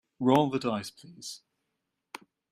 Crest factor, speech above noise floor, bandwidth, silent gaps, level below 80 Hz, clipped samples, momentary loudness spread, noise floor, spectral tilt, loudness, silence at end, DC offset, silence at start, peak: 22 dB; 54 dB; 15 kHz; none; -72 dBFS; under 0.1%; 23 LU; -83 dBFS; -6 dB/octave; -27 LUFS; 1.15 s; under 0.1%; 0.2 s; -8 dBFS